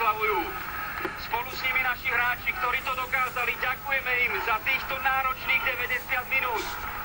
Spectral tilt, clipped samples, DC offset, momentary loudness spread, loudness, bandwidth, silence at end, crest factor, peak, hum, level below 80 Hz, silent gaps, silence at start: -3 dB/octave; under 0.1%; under 0.1%; 7 LU; -26 LUFS; 16 kHz; 0 s; 18 dB; -10 dBFS; none; -48 dBFS; none; 0 s